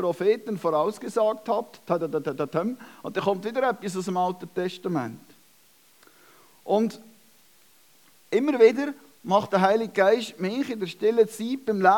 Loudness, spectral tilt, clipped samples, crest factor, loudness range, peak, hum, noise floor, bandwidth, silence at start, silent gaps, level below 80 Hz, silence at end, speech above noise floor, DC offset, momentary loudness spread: -25 LUFS; -6 dB/octave; under 0.1%; 20 dB; 9 LU; -4 dBFS; none; -59 dBFS; 18 kHz; 0 s; none; -82 dBFS; 0 s; 35 dB; under 0.1%; 9 LU